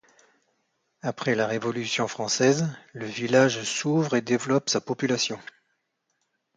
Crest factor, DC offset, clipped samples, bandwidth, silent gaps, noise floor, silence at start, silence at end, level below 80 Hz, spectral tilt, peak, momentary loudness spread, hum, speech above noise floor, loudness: 20 dB; under 0.1%; under 0.1%; 9.6 kHz; none; -76 dBFS; 1.05 s; 1.15 s; -70 dBFS; -4 dB/octave; -8 dBFS; 11 LU; none; 51 dB; -25 LUFS